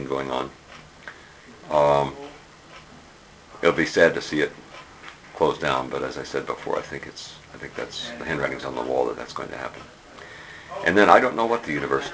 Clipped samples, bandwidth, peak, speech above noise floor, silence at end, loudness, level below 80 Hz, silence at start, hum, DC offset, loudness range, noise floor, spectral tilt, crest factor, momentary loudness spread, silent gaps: under 0.1%; 8 kHz; 0 dBFS; 25 dB; 0 s; -23 LUFS; -54 dBFS; 0 s; none; under 0.1%; 7 LU; -49 dBFS; -4.5 dB/octave; 26 dB; 24 LU; none